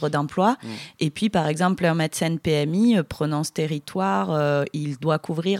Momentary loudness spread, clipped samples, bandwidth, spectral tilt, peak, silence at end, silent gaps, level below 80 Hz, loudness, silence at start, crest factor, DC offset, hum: 7 LU; under 0.1%; 15.5 kHz; -6 dB/octave; -6 dBFS; 0 s; none; -56 dBFS; -23 LUFS; 0 s; 16 dB; under 0.1%; none